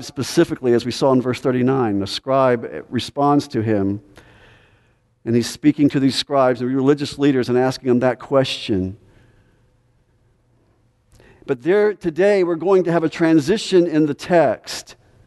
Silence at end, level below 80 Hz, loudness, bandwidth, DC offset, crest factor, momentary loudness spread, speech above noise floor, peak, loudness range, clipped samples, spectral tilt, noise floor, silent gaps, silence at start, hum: 0.35 s; -56 dBFS; -18 LUFS; 12 kHz; under 0.1%; 16 dB; 8 LU; 42 dB; -2 dBFS; 7 LU; under 0.1%; -6 dB/octave; -59 dBFS; none; 0 s; none